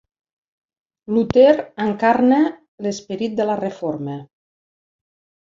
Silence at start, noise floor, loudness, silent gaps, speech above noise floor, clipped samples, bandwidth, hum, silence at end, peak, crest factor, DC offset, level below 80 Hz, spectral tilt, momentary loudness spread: 1.1 s; under -90 dBFS; -19 LUFS; 2.68-2.78 s; over 72 dB; under 0.1%; 7.6 kHz; none; 1.25 s; -2 dBFS; 18 dB; under 0.1%; -54 dBFS; -6.5 dB/octave; 14 LU